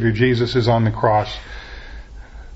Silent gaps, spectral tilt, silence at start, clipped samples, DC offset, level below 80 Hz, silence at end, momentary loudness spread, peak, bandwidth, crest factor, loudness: none; -7.5 dB/octave; 0 s; under 0.1%; under 0.1%; -36 dBFS; 0 s; 21 LU; -2 dBFS; 8 kHz; 18 dB; -18 LUFS